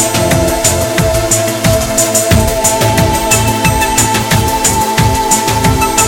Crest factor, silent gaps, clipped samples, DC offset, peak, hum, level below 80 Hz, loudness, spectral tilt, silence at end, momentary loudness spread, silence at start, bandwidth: 10 dB; none; under 0.1%; under 0.1%; 0 dBFS; none; -24 dBFS; -10 LUFS; -3.5 dB/octave; 0 s; 2 LU; 0 s; 17.5 kHz